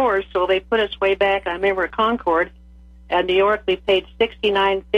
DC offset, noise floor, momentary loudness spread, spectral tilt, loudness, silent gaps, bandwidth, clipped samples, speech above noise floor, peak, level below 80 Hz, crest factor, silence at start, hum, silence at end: under 0.1%; -44 dBFS; 4 LU; -5.5 dB/octave; -19 LUFS; none; 6.8 kHz; under 0.1%; 25 dB; -6 dBFS; -44 dBFS; 14 dB; 0 s; none; 0 s